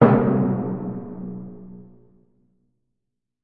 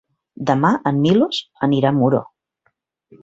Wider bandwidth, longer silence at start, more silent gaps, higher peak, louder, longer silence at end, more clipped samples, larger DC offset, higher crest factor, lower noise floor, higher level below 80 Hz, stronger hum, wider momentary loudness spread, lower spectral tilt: second, 4.4 kHz vs 7.8 kHz; second, 0 s vs 0.4 s; neither; about the same, 0 dBFS vs -2 dBFS; second, -23 LUFS vs -18 LUFS; first, 1.6 s vs 1 s; neither; neither; first, 22 dB vs 16 dB; first, -82 dBFS vs -68 dBFS; about the same, -54 dBFS vs -58 dBFS; neither; first, 24 LU vs 6 LU; first, -12.5 dB/octave vs -7.5 dB/octave